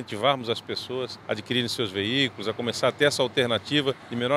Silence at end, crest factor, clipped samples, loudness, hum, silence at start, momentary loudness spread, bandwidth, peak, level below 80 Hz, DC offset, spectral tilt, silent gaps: 0 s; 20 dB; under 0.1%; -26 LUFS; none; 0 s; 9 LU; 15.5 kHz; -6 dBFS; -66 dBFS; under 0.1%; -4 dB/octave; none